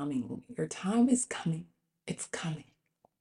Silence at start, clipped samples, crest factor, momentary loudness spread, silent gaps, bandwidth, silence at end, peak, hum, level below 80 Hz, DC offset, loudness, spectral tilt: 0 s; under 0.1%; 18 dB; 15 LU; none; 11.5 kHz; 0.6 s; -16 dBFS; none; -72 dBFS; under 0.1%; -33 LUFS; -5 dB/octave